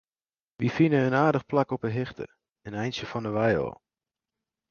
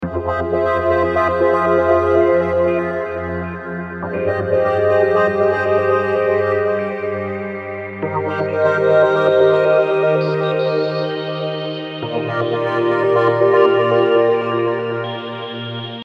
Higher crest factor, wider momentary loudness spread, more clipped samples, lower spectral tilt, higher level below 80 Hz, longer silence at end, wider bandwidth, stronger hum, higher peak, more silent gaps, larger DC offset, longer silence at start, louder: about the same, 20 dB vs 16 dB; first, 15 LU vs 12 LU; neither; about the same, -7.5 dB/octave vs -7.5 dB/octave; second, -58 dBFS vs -46 dBFS; first, 0.95 s vs 0 s; about the same, 7 kHz vs 7 kHz; neither; second, -8 dBFS vs -2 dBFS; first, 2.51-2.55 s vs none; neither; first, 0.6 s vs 0 s; second, -27 LUFS vs -17 LUFS